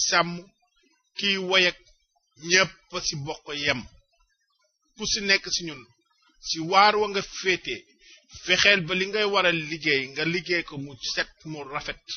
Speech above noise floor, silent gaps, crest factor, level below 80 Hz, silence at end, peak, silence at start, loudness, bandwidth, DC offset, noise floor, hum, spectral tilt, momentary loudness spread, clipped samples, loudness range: 46 dB; none; 22 dB; -56 dBFS; 0 s; -4 dBFS; 0 s; -24 LUFS; 6.8 kHz; under 0.1%; -72 dBFS; none; -1 dB/octave; 17 LU; under 0.1%; 5 LU